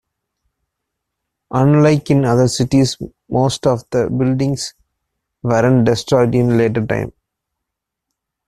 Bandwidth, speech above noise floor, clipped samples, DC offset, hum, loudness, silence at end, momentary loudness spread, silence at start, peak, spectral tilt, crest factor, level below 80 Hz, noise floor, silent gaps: 13.5 kHz; 65 dB; under 0.1%; under 0.1%; none; -15 LUFS; 1.35 s; 10 LU; 1.5 s; -2 dBFS; -6.5 dB/octave; 16 dB; -44 dBFS; -80 dBFS; none